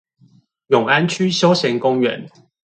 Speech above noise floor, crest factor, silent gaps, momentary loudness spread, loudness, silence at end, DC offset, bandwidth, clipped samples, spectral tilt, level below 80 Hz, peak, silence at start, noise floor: 37 dB; 18 dB; none; 5 LU; -16 LUFS; 0.35 s; under 0.1%; 9.2 kHz; under 0.1%; -5 dB/octave; -64 dBFS; 0 dBFS; 0.7 s; -54 dBFS